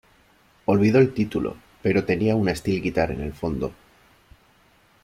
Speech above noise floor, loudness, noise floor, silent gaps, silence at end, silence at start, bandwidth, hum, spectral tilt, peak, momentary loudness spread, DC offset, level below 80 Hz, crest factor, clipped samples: 37 dB; -23 LUFS; -58 dBFS; none; 1.3 s; 0.7 s; 15 kHz; none; -7.5 dB/octave; -6 dBFS; 12 LU; under 0.1%; -46 dBFS; 18 dB; under 0.1%